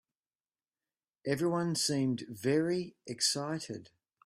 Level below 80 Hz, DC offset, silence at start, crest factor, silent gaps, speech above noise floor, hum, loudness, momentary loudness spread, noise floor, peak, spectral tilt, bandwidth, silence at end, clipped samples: -74 dBFS; under 0.1%; 1.25 s; 20 dB; none; over 57 dB; none; -32 LUFS; 12 LU; under -90 dBFS; -16 dBFS; -4 dB/octave; 15.5 kHz; 0.4 s; under 0.1%